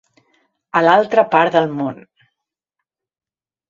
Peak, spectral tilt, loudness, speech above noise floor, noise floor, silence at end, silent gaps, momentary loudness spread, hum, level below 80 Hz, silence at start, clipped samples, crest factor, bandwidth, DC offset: 0 dBFS; -6.5 dB/octave; -15 LUFS; 67 dB; -81 dBFS; 1.75 s; none; 10 LU; none; -66 dBFS; 0.75 s; under 0.1%; 18 dB; 7.4 kHz; under 0.1%